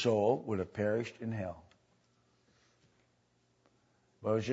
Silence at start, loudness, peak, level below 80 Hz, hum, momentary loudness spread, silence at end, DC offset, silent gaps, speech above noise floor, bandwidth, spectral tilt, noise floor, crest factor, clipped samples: 0 s; -35 LUFS; -16 dBFS; -70 dBFS; 60 Hz at -75 dBFS; 11 LU; 0 s; under 0.1%; none; 41 dB; 7.6 kHz; -6 dB/octave; -74 dBFS; 20 dB; under 0.1%